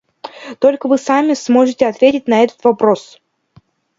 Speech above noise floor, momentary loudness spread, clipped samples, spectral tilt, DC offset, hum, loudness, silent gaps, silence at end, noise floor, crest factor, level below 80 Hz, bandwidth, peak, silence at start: 38 dB; 10 LU; under 0.1%; -5 dB/octave; under 0.1%; none; -14 LUFS; none; 0.95 s; -51 dBFS; 14 dB; -60 dBFS; 7.8 kHz; 0 dBFS; 0.25 s